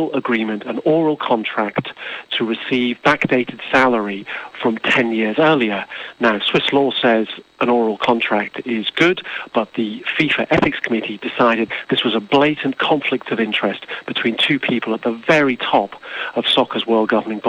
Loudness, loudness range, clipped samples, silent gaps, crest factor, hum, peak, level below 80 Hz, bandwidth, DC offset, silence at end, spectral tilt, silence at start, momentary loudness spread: -18 LUFS; 2 LU; under 0.1%; none; 14 dB; none; -4 dBFS; -56 dBFS; 11 kHz; under 0.1%; 0 s; -5.5 dB/octave; 0 s; 8 LU